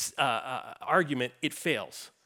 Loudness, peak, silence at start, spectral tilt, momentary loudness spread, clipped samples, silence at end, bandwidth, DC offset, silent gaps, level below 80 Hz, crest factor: -30 LUFS; -10 dBFS; 0 s; -3.5 dB/octave; 11 LU; under 0.1%; 0.15 s; 19.5 kHz; under 0.1%; none; -78 dBFS; 20 dB